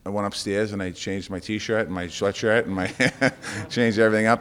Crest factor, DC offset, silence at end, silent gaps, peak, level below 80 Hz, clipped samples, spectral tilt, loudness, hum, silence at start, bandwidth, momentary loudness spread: 20 dB; under 0.1%; 0 s; none; -4 dBFS; -56 dBFS; under 0.1%; -5 dB/octave; -24 LUFS; none; 0.05 s; 15 kHz; 10 LU